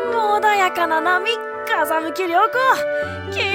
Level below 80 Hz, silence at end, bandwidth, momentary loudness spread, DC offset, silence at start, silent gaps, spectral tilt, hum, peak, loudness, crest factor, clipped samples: -60 dBFS; 0 s; 17 kHz; 7 LU; under 0.1%; 0 s; none; -3.5 dB/octave; none; -4 dBFS; -18 LUFS; 14 dB; under 0.1%